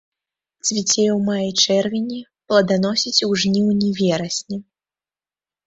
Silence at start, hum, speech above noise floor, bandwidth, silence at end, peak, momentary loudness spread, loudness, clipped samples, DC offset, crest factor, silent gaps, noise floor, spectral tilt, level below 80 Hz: 0.65 s; none; over 71 dB; 8 kHz; 1.05 s; -2 dBFS; 9 LU; -18 LUFS; under 0.1%; under 0.1%; 18 dB; none; under -90 dBFS; -4 dB/octave; -60 dBFS